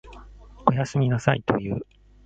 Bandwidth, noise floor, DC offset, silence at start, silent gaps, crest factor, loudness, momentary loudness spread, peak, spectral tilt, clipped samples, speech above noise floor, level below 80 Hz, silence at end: 8 kHz; -45 dBFS; under 0.1%; 0.05 s; none; 24 dB; -24 LUFS; 10 LU; -2 dBFS; -7 dB/octave; under 0.1%; 22 dB; -48 dBFS; 0.4 s